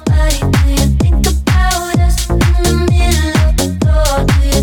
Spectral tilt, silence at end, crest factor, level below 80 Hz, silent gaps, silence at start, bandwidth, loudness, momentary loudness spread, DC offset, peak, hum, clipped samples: -5 dB/octave; 0 s; 10 dB; -14 dBFS; none; 0 s; 18.5 kHz; -13 LUFS; 2 LU; under 0.1%; 0 dBFS; none; under 0.1%